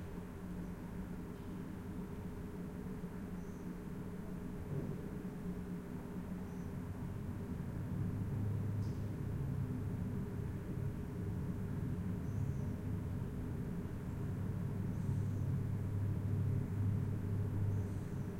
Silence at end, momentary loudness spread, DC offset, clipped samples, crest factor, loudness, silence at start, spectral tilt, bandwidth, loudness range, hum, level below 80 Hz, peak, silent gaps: 0 s; 8 LU; under 0.1%; under 0.1%; 14 dB; -42 LUFS; 0 s; -9 dB/octave; 16.5 kHz; 7 LU; none; -52 dBFS; -26 dBFS; none